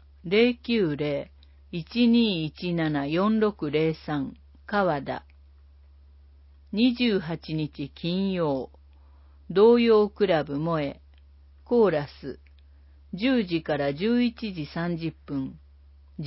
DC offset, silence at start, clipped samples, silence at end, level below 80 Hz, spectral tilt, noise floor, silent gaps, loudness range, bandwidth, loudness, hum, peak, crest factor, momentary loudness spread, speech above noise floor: under 0.1%; 0.25 s; under 0.1%; 0 s; -52 dBFS; -10.5 dB/octave; -53 dBFS; none; 5 LU; 5.8 kHz; -25 LUFS; none; -8 dBFS; 18 dB; 15 LU; 28 dB